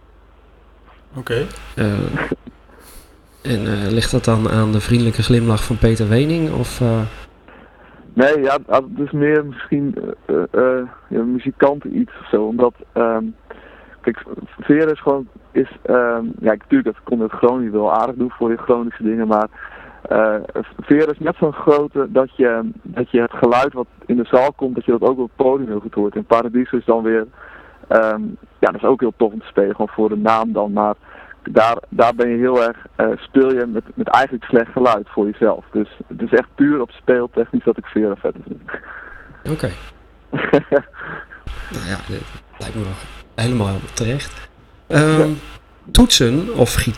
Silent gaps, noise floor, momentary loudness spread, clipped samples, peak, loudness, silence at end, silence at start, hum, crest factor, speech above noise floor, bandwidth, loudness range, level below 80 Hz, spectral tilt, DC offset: none; -47 dBFS; 13 LU; under 0.1%; 0 dBFS; -17 LUFS; 0 s; 1.15 s; none; 18 dB; 30 dB; 15.5 kHz; 6 LU; -36 dBFS; -6 dB/octave; under 0.1%